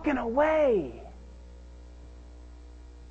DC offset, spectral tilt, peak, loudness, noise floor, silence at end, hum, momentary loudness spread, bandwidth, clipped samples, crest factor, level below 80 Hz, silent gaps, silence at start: under 0.1%; -7 dB/octave; -12 dBFS; -26 LUFS; -47 dBFS; 0 s; 60 Hz at -45 dBFS; 26 LU; 8.2 kHz; under 0.1%; 18 dB; -46 dBFS; none; 0 s